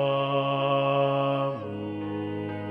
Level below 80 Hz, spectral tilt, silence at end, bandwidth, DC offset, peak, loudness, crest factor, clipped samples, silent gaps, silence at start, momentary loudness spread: -70 dBFS; -8.5 dB/octave; 0 s; 5.2 kHz; under 0.1%; -14 dBFS; -27 LUFS; 14 dB; under 0.1%; none; 0 s; 9 LU